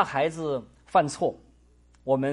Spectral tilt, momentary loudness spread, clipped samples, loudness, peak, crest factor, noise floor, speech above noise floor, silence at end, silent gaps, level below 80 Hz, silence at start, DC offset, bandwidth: -5.5 dB/octave; 9 LU; under 0.1%; -27 LUFS; -8 dBFS; 20 dB; -58 dBFS; 33 dB; 0 s; none; -58 dBFS; 0 s; under 0.1%; 11.5 kHz